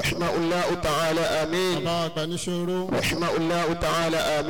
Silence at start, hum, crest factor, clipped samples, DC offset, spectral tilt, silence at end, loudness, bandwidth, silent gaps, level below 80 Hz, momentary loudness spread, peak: 0 s; none; 8 dB; under 0.1%; 0.8%; -4.5 dB/octave; 0 s; -25 LUFS; 19 kHz; none; -46 dBFS; 4 LU; -16 dBFS